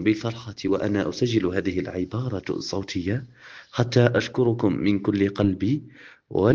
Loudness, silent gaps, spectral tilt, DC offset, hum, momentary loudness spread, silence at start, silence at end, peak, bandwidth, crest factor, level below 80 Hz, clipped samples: -25 LUFS; none; -7 dB/octave; under 0.1%; none; 9 LU; 0 s; 0 s; -4 dBFS; 7.4 kHz; 20 dB; -56 dBFS; under 0.1%